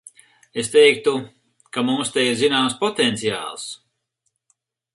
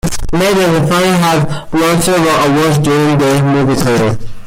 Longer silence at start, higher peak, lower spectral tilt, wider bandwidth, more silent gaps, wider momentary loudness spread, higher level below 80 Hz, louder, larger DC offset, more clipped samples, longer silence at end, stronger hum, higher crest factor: first, 0.55 s vs 0.05 s; about the same, 0 dBFS vs -2 dBFS; second, -3 dB/octave vs -5.5 dB/octave; second, 11.5 kHz vs 16.5 kHz; neither; first, 17 LU vs 4 LU; second, -66 dBFS vs -30 dBFS; second, -19 LUFS vs -11 LUFS; neither; neither; first, 1.2 s vs 0 s; neither; first, 20 dB vs 10 dB